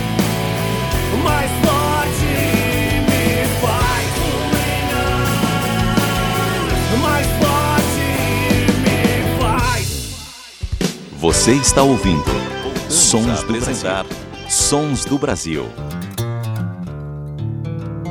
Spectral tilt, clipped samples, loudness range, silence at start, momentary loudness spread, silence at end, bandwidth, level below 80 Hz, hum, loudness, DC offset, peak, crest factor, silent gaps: -4 dB/octave; under 0.1%; 4 LU; 0 s; 12 LU; 0 s; 19.5 kHz; -28 dBFS; none; -17 LUFS; under 0.1%; 0 dBFS; 18 dB; none